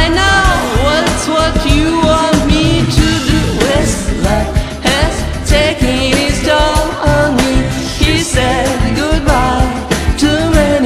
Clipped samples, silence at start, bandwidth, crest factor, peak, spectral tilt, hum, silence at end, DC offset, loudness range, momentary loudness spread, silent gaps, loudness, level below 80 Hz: 0.2%; 0 s; 14.5 kHz; 12 dB; 0 dBFS; -4.5 dB/octave; none; 0 s; under 0.1%; 2 LU; 4 LU; none; -12 LUFS; -18 dBFS